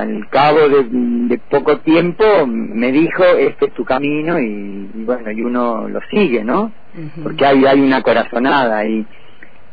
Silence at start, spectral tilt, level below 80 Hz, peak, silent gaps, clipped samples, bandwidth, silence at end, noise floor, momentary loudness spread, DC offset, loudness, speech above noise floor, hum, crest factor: 0 s; -8.5 dB/octave; -50 dBFS; -2 dBFS; none; under 0.1%; 5 kHz; 0.65 s; -43 dBFS; 12 LU; 4%; -14 LUFS; 29 dB; none; 12 dB